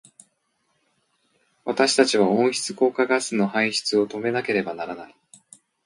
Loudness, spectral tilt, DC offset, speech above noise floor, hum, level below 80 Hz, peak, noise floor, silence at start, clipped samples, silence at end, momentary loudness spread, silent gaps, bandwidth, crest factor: -22 LUFS; -3.5 dB/octave; under 0.1%; 49 dB; none; -70 dBFS; -2 dBFS; -71 dBFS; 1.65 s; under 0.1%; 0.8 s; 13 LU; none; 11.5 kHz; 22 dB